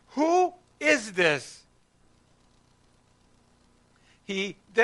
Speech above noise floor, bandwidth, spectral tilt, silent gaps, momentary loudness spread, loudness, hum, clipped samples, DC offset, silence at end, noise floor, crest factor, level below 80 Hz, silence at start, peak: 36 dB; 11.5 kHz; -3.5 dB/octave; none; 9 LU; -26 LUFS; 60 Hz at -65 dBFS; under 0.1%; under 0.1%; 0 s; -63 dBFS; 22 dB; -68 dBFS; 0.15 s; -6 dBFS